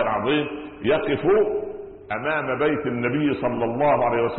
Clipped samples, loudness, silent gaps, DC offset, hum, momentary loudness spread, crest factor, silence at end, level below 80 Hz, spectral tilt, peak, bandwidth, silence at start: under 0.1%; -23 LUFS; none; under 0.1%; none; 10 LU; 12 dB; 0 s; -52 dBFS; -11 dB/octave; -10 dBFS; 4.3 kHz; 0 s